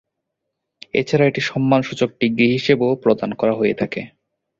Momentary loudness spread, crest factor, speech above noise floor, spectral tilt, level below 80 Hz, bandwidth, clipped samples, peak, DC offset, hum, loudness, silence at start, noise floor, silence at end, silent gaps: 7 LU; 18 dB; 61 dB; -6.5 dB/octave; -56 dBFS; 7.8 kHz; under 0.1%; -2 dBFS; under 0.1%; none; -18 LUFS; 0.95 s; -78 dBFS; 0.5 s; none